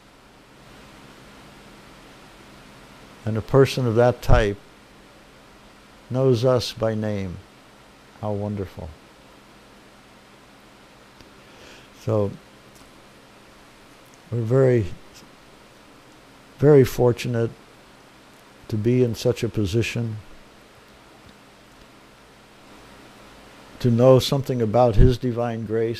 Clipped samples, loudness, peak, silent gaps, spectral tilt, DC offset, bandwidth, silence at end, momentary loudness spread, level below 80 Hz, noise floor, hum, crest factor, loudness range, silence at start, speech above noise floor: under 0.1%; -21 LUFS; -2 dBFS; none; -7 dB/octave; under 0.1%; 15 kHz; 0 s; 18 LU; -34 dBFS; -50 dBFS; none; 22 dB; 13 LU; 3.25 s; 31 dB